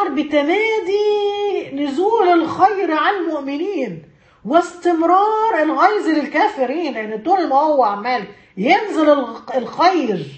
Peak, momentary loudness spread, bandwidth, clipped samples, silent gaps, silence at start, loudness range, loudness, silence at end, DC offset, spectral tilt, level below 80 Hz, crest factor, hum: 0 dBFS; 9 LU; 8.6 kHz; under 0.1%; none; 0 s; 1 LU; -17 LUFS; 0 s; under 0.1%; -5.5 dB/octave; -62 dBFS; 16 dB; none